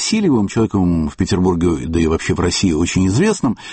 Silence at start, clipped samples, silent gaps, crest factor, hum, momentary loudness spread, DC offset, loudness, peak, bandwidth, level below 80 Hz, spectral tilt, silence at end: 0 s; under 0.1%; none; 12 dB; none; 3 LU; under 0.1%; -16 LUFS; -4 dBFS; 8.8 kHz; -32 dBFS; -5.5 dB/octave; 0 s